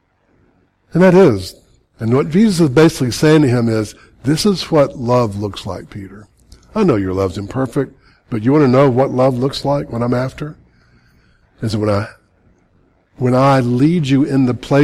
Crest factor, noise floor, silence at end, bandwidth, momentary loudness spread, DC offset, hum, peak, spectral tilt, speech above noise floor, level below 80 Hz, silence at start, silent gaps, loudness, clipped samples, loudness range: 12 dB; -56 dBFS; 0 s; 14.5 kHz; 15 LU; under 0.1%; none; -2 dBFS; -7 dB/octave; 43 dB; -44 dBFS; 0.95 s; none; -15 LUFS; under 0.1%; 7 LU